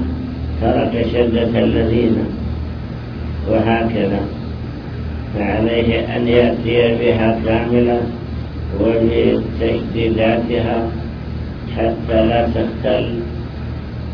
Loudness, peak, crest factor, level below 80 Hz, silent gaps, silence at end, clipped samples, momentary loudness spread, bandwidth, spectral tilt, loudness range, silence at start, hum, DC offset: -18 LUFS; 0 dBFS; 16 dB; -28 dBFS; none; 0 s; under 0.1%; 12 LU; 5.4 kHz; -9.5 dB/octave; 4 LU; 0 s; none; under 0.1%